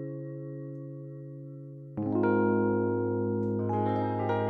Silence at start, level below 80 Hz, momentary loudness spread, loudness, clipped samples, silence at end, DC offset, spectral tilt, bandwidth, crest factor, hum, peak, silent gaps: 0 s; -70 dBFS; 17 LU; -30 LUFS; under 0.1%; 0 s; under 0.1%; -11 dB/octave; 4.7 kHz; 16 dB; none; -14 dBFS; none